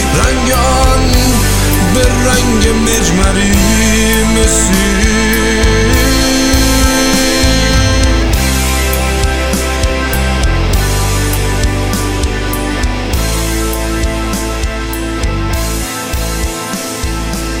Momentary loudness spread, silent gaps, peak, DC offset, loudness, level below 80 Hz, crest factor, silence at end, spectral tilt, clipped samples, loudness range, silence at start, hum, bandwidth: 7 LU; none; 0 dBFS; under 0.1%; -12 LUFS; -16 dBFS; 12 dB; 0 s; -4 dB/octave; under 0.1%; 6 LU; 0 s; none; 17 kHz